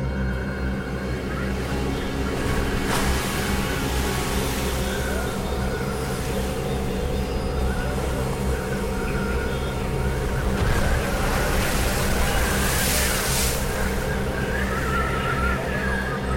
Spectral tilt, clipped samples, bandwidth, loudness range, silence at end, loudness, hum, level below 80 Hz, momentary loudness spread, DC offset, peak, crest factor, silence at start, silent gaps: -4.5 dB/octave; under 0.1%; 17 kHz; 4 LU; 0 s; -24 LUFS; none; -28 dBFS; 5 LU; 0.2%; -8 dBFS; 14 dB; 0 s; none